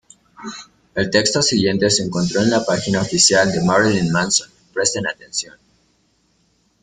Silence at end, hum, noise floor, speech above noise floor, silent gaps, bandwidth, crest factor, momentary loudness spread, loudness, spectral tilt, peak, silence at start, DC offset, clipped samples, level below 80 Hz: 1.4 s; none; -62 dBFS; 44 dB; none; 9.6 kHz; 20 dB; 18 LU; -17 LUFS; -3.5 dB/octave; 0 dBFS; 0.4 s; under 0.1%; under 0.1%; -50 dBFS